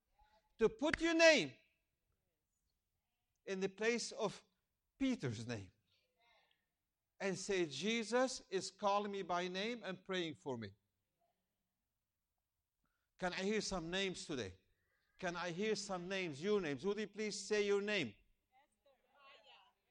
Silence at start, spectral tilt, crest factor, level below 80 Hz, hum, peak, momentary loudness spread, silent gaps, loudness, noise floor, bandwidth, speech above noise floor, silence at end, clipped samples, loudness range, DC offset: 0.6 s; -4 dB/octave; 26 dB; -70 dBFS; none; -16 dBFS; 10 LU; none; -39 LUFS; under -90 dBFS; 11 kHz; over 51 dB; 0.4 s; under 0.1%; 9 LU; under 0.1%